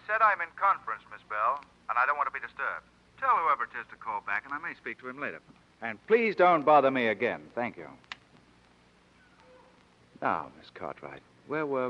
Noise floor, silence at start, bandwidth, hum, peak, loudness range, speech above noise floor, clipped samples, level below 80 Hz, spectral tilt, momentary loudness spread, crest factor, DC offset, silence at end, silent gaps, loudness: -62 dBFS; 0.1 s; 8.6 kHz; none; -10 dBFS; 13 LU; 32 dB; under 0.1%; -72 dBFS; -6.5 dB/octave; 20 LU; 20 dB; under 0.1%; 0 s; none; -29 LUFS